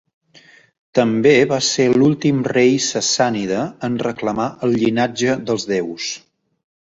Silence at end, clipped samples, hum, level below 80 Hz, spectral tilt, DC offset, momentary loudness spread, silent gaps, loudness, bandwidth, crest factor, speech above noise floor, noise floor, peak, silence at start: 0.75 s; under 0.1%; none; -56 dBFS; -4.5 dB/octave; under 0.1%; 8 LU; none; -17 LUFS; 8 kHz; 16 dB; 32 dB; -49 dBFS; -2 dBFS; 0.95 s